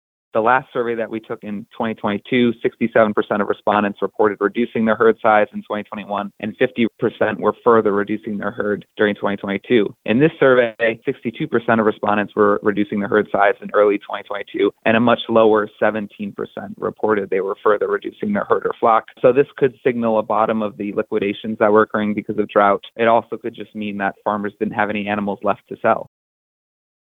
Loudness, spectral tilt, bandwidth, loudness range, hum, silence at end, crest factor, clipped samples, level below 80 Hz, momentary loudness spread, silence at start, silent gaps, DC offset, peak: -19 LUFS; -8.5 dB/octave; 4.1 kHz; 3 LU; none; 1.05 s; 16 dB; under 0.1%; -62 dBFS; 11 LU; 0.35 s; none; under 0.1%; -2 dBFS